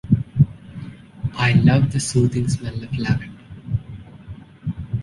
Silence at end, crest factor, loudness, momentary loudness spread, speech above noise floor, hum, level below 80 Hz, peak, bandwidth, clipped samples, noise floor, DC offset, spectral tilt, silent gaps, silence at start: 0 s; 18 dB; -21 LUFS; 23 LU; 21 dB; none; -40 dBFS; -2 dBFS; 11.5 kHz; under 0.1%; -39 dBFS; under 0.1%; -6.5 dB/octave; none; 0.05 s